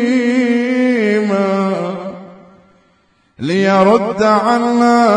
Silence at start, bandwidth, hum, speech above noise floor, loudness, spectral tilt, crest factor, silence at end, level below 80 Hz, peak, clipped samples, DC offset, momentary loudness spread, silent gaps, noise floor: 0 s; 10.5 kHz; none; 45 dB; -13 LUFS; -6.5 dB/octave; 14 dB; 0 s; -58 dBFS; 0 dBFS; under 0.1%; under 0.1%; 12 LU; none; -56 dBFS